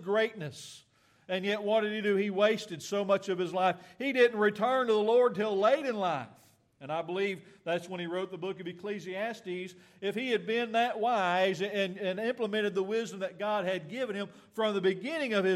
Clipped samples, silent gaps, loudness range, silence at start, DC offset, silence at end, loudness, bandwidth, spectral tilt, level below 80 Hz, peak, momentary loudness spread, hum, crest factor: under 0.1%; none; 8 LU; 0 s; under 0.1%; 0 s; -31 LUFS; 14 kHz; -5 dB/octave; -82 dBFS; -12 dBFS; 12 LU; none; 18 dB